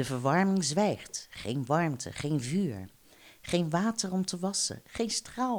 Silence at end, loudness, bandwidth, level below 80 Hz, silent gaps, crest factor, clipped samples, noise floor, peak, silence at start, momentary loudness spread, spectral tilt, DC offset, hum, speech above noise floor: 0 s; -30 LUFS; over 20 kHz; -62 dBFS; none; 18 dB; under 0.1%; -57 dBFS; -12 dBFS; 0 s; 10 LU; -4.5 dB/octave; under 0.1%; none; 26 dB